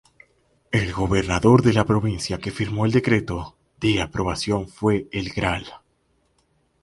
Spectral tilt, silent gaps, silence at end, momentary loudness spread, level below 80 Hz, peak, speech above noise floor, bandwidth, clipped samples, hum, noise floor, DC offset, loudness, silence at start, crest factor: -6 dB/octave; none; 1.05 s; 11 LU; -40 dBFS; -2 dBFS; 45 dB; 11.5 kHz; under 0.1%; none; -66 dBFS; under 0.1%; -22 LUFS; 0.7 s; 20 dB